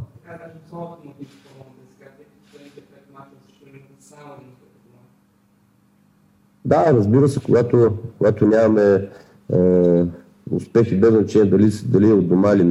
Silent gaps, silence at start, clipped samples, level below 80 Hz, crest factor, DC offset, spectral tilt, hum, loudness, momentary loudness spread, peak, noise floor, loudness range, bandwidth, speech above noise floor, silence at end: none; 0 s; under 0.1%; -54 dBFS; 16 dB; under 0.1%; -9 dB/octave; none; -16 LUFS; 20 LU; -2 dBFS; -58 dBFS; 5 LU; 11.5 kHz; 41 dB; 0 s